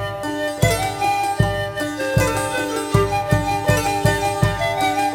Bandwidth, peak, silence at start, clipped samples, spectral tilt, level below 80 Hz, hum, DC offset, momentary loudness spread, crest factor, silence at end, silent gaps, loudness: 16 kHz; -2 dBFS; 0 s; under 0.1%; -5 dB/octave; -34 dBFS; none; under 0.1%; 5 LU; 16 dB; 0 s; none; -20 LUFS